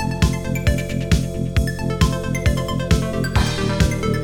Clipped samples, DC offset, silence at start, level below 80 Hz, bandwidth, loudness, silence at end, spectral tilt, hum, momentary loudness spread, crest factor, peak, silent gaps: under 0.1%; 0.3%; 0 s; -26 dBFS; 18 kHz; -20 LUFS; 0 s; -5.5 dB/octave; none; 2 LU; 16 dB; -2 dBFS; none